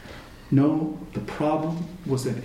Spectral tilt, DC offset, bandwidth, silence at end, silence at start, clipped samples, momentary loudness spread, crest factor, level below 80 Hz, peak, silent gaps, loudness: -7.5 dB/octave; under 0.1%; 15 kHz; 0 s; 0 s; under 0.1%; 12 LU; 18 dB; -50 dBFS; -8 dBFS; none; -26 LUFS